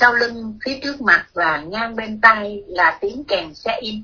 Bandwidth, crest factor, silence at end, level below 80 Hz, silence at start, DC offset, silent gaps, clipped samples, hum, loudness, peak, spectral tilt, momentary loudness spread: 5.4 kHz; 18 dB; 0 s; -50 dBFS; 0 s; under 0.1%; none; under 0.1%; none; -18 LUFS; 0 dBFS; -4 dB/octave; 12 LU